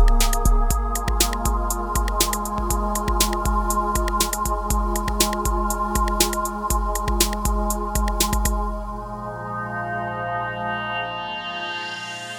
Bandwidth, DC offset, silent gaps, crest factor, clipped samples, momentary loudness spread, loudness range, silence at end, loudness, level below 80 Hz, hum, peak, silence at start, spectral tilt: over 20 kHz; under 0.1%; none; 20 dB; under 0.1%; 7 LU; 5 LU; 0 s; -23 LUFS; -24 dBFS; none; 0 dBFS; 0 s; -3.5 dB/octave